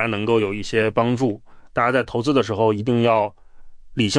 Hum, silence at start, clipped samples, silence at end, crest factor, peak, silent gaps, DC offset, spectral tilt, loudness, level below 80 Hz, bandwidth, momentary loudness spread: none; 0 s; under 0.1%; 0 s; 16 dB; -4 dBFS; none; under 0.1%; -6 dB/octave; -20 LUFS; -48 dBFS; 10.5 kHz; 8 LU